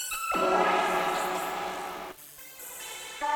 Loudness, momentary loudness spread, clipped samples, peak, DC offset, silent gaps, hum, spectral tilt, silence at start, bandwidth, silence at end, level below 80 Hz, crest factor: -29 LUFS; 18 LU; under 0.1%; -12 dBFS; under 0.1%; none; none; -2.5 dB/octave; 0 s; over 20 kHz; 0 s; -62 dBFS; 18 dB